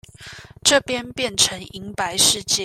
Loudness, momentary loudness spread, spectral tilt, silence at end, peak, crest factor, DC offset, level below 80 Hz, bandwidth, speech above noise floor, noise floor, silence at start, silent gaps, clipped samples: -18 LUFS; 21 LU; -1 dB/octave; 0 s; -2 dBFS; 20 dB; under 0.1%; -52 dBFS; 16 kHz; 20 dB; -41 dBFS; 0.2 s; none; under 0.1%